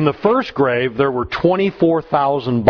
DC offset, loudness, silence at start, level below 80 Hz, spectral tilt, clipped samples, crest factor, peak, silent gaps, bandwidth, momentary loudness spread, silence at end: under 0.1%; -17 LUFS; 0 s; -46 dBFS; -8.5 dB/octave; under 0.1%; 16 dB; 0 dBFS; none; 5.4 kHz; 2 LU; 0 s